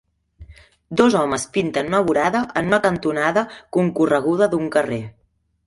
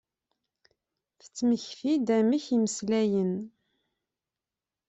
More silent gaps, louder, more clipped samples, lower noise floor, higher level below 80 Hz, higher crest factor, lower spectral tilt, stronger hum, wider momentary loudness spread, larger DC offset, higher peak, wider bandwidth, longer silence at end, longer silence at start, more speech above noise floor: neither; first, -19 LUFS vs -27 LUFS; neither; second, -45 dBFS vs under -90 dBFS; first, -52 dBFS vs -72 dBFS; about the same, 18 dB vs 16 dB; about the same, -5.5 dB/octave vs -5.5 dB/octave; neither; second, 7 LU vs 10 LU; neither; first, -2 dBFS vs -14 dBFS; first, 11.5 kHz vs 8.2 kHz; second, 0.55 s vs 1.4 s; second, 0.4 s vs 1.35 s; second, 26 dB vs over 63 dB